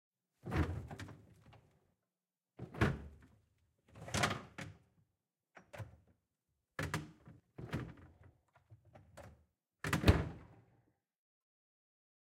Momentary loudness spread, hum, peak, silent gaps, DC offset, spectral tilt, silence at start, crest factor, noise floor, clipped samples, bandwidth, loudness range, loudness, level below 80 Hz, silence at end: 25 LU; none; -12 dBFS; none; under 0.1%; -5.5 dB/octave; 0.45 s; 32 dB; under -90 dBFS; under 0.1%; 16 kHz; 9 LU; -39 LUFS; -54 dBFS; 1.75 s